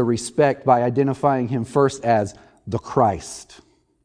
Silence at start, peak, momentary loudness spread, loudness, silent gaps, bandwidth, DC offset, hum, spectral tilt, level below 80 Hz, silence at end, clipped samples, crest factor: 0 s; -2 dBFS; 13 LU; -20 LUFS; none; 10.5 kHz; under 0.1%; none; -6.5 dB/octave; -52 dBFS; 0.6 s; under 0.1%; 18 dB